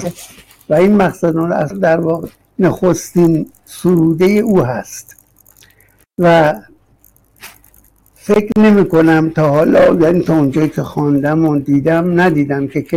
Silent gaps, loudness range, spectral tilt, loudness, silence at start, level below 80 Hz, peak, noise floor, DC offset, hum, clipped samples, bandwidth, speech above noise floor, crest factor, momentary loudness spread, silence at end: none; 6 LU; -7 dB/octave; -12 LUFS; 0 s; -44 dBFS; -2 dBFS; -51 dBFS; under 0.1%; none; under 0.1%; 16 kHz; 39 dB; 10 dB; 11 LU; 0 s